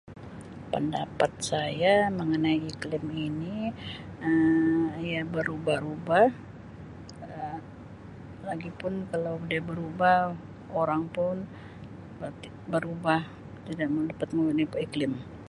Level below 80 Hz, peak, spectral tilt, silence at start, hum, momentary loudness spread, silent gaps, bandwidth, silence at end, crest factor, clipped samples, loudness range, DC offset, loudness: -56 dBFS; -8 dBFS; -6 dB/octave; 0.05 s; none; 21 LU; none; 11.5 kHz; 0 s; 22 dB; under 0.1%; 5 LU; under 0.1%; -28 LUFS